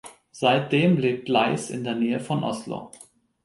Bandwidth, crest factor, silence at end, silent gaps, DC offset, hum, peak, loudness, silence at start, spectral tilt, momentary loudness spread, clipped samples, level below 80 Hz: 11.5 kHz; 18 dB; 0.55 s; none; under 0.1%; none; -6 dBFS; -23 LUFS; 0.05 s; -6 dB/octave; 15 LU; under 0.1%; -66 dBFS